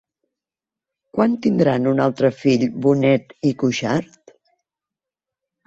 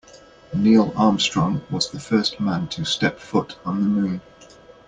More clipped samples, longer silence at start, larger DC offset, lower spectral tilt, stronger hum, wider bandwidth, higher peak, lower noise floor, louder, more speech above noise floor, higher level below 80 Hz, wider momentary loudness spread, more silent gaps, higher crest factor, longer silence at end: neither; first, 1.15 s vs 0.15 s; neither; first, -7 dB/octave vs -5 dB/octave; neither; second, 7.8 kHz vs 9.4 kHz; first, -2 dBFS vs -6 dBFS; first, -89 dBFS vs -47 dBFS; about the same, -19 LUFS vs -21 LUFS; first, 71 dB vs 27 dB; second, -60 dBFS vs -54 dBFS; second, 6 LU vs 9 LU; neither; about the same, 18 dB vs 16 dB; first, 1.65 s vs 0.45 s